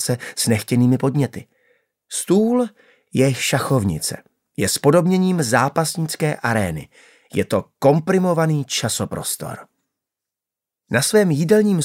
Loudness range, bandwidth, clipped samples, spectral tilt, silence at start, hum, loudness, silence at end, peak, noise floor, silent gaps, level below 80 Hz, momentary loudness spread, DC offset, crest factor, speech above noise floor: 3 LU; 16 kHz; under 0.1%; -5 dB/octave; 0 s; none; -19 LUFS; 0 s; -2 dBFS; -87 dBFS; none; -54 dBFS; 11 LU; under 0.1%; 18 dB; 69 dB